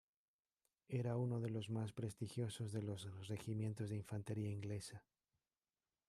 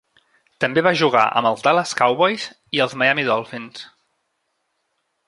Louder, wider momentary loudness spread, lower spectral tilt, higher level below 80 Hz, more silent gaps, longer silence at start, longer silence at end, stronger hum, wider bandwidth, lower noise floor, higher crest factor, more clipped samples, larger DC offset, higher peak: second, -46 LUFS vs -18 LUFS; second, 7 LU vs 15 LU; first, -7 dB/octave vs -4 dB/octave; second, -78 dBFS vs -66 dBFS; neither; first, 0.9 s vs 0.6 s; second, 1.1 s vs 1.4 s; neither; first, 13 kHz vs 11.5 kHz; first, under -90 dBFS vs -72 dBFS; second, 14 dB vs 20 dB; neither; neither; second, -32 dBFS vs -2 dBFS